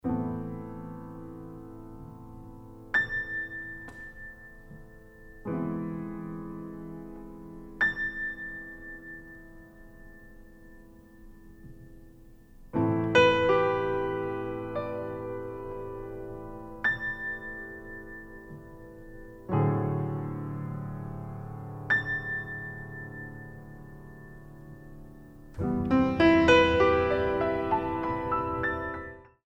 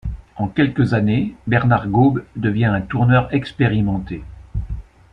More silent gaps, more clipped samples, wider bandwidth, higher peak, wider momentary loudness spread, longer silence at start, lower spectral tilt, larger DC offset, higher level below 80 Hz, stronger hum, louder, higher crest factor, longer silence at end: neither; neither; first, 8.6 kHz vs 5.8 kHz; second, -8 dBFS vs -2 dBFS; first, 24 LU vs 15 LU; about the same, 0.05 s vs 0.05 s; second, -6.5 dB/octave vs -9.5 dB/octave; neither; second, -50 dBFS vs -36 dBFS; neither; second, -29 LUFS vs -18 LUFS; first, 22 dB vs 16 dB; about the same, 0.2 s vs 0.3 s